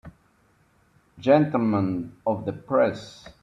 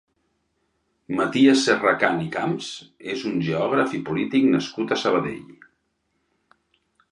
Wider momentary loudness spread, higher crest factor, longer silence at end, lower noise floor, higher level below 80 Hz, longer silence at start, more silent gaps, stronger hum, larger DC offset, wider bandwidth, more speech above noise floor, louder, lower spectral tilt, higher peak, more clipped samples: second, 11 LU vs 14 LU; about the same, 20 dB vs 22 dB; second, 0.1 s vs 1.6 s; second, -63 dBFS vs -72 dBFS; about the same, -60 dBFS vs -62 dBFS; second, 0.05 s vs 1.1 s; neither; neither; neither; second, 7.8 kHz vs 11 kHz; second, 39 dB vs 51 dB; about the same, -24 LUFS vs -22 LUFS; first, -8 dB/octave vs -5 dB/octave; second, -6 dBFS vs -2 dBFS; neither